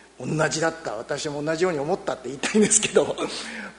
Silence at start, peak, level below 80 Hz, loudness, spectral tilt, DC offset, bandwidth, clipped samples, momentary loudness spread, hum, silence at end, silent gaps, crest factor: 0.2 s; -4 dBFS; -58 dBFS; -24 LUFS; -3 dB/octave; under 0.1%; 11 kHz; under 0.1%; 12 LU; none; 0 s; none; 22 dB